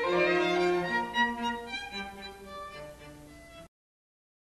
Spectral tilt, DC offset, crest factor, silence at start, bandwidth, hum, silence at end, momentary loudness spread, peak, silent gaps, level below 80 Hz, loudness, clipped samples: -4.5 dB/octave; under 0.1%; 18 dB; 0 s; 12.5 kHz; none; 0.8 s; 23 LU; -16 dBFS; none; -58 dBFS; -29 LUFS; under 0.1%